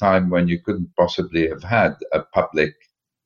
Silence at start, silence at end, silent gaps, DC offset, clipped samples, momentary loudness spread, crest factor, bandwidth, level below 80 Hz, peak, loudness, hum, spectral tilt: 0 s; 0.55 s; none; under 0.1%; under 0.1%; 6 LU; 18 dB; 7 kHz; -48 dBFS; -4 dBFS; -20 LUFS; none; -7.5 dB/octave